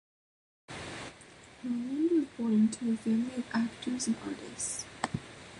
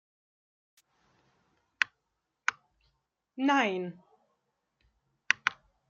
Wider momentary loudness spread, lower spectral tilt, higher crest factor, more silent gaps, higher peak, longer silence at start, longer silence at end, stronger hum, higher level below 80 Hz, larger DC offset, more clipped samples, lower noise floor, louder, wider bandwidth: first, 16 LU vs 11 LU; first, -4.5 dB/octave vs -3 dB/octave; second, 22 dB vs 32 dB; neither; second, -12 dBFS vs -4 dBFS; second, 0.7 s vs 1.8 s; second, 0 s vs 0.35 s; neither; first, -64 dBFS vs -80 dBFS; neither; neither; second, -54 dBFS vs -83 dBFS; about the same, -33 LUFS vs -31 LUFS; first, 11.5 kHz vs 7.6 kHz